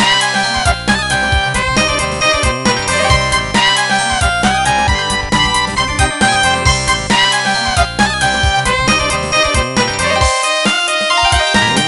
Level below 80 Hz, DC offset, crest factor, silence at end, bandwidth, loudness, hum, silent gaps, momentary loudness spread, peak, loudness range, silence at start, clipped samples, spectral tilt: -24 dBFS; under 0.1%; 14 dB; 0 s; 12 kHz; -12 LUFS; none; none; 3 LU; 0 dBFS; 1 LU; 0 s; under 0.1%; -3 dB/octave